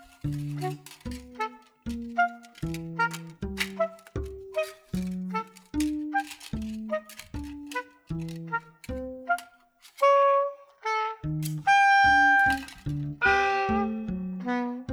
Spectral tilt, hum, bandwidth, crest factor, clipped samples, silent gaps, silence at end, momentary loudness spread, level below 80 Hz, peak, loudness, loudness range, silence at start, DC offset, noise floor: -5 dB/octave; none; over 20 kHz; 20 dB; under 0.1%; none; 0 s; 17 LU; -48 dBFS; -8 dBFS; -27 LUFS; 11 LU; 0 s; under 0.1%; -57 dBFS